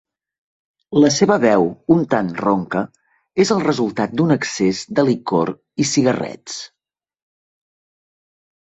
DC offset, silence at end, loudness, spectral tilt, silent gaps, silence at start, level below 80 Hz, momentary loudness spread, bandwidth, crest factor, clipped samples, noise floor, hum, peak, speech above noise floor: under 0.1%; 2.05 s; -18 LUFS; -5 dB/octave; none; 0.9 s; -56 dBFS; 12 LU; 8.2 kHz; 18 dB; under 0.1%; under -90 dBFS; none; -2 dBFS; over 73 dB